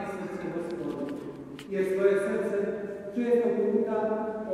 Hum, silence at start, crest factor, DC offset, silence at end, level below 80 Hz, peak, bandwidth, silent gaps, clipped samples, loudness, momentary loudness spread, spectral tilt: none; 0 s; 18 dB; under 0.1%; 0 s; -66 dBFS; -12 dBFS; 13 kHz; none; under 0.1%; -29 LUFS; 11 LU; -7 dB/octave